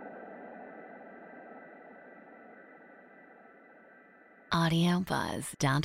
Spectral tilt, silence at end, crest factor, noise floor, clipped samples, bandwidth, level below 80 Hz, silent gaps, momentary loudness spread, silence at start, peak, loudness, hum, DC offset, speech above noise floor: -5.5 dB/octave; 0 s; 20 dB; -58 dBFS; under 0.1%; 15.5 kHz; -64 dBFS; none; 27 LU; 0 s; -16 dBFS; -30 LUFS; none; under 0.1%; 29 dB